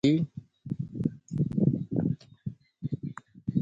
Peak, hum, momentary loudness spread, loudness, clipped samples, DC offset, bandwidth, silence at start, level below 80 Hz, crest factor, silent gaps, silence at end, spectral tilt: -10 dBFS; none; 15 LU; -32 LUFS; under 0.1%; under 0.1%; 7.6 kHz; 0.05 s; -58 dBFS; 20 dB; none; 0 s; -8.5 dB/octave